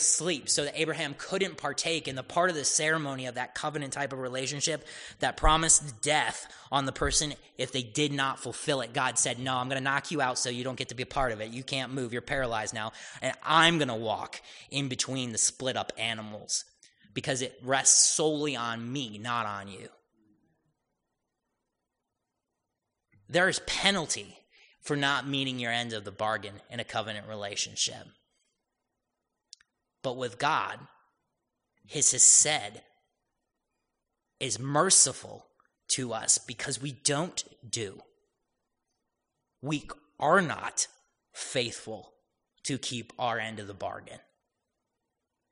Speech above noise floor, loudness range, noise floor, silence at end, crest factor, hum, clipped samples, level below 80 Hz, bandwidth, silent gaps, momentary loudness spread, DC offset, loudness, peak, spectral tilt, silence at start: 55 dB; 11 LU; -85 dBFS; 1.35 s; 26 dB; none; under 0.1%; -50 dBFS; 10.5 kHz; none; 15 LU; under 0.1%; -28 LUFS; -6 dBFS; -2 dB/octave; 0 s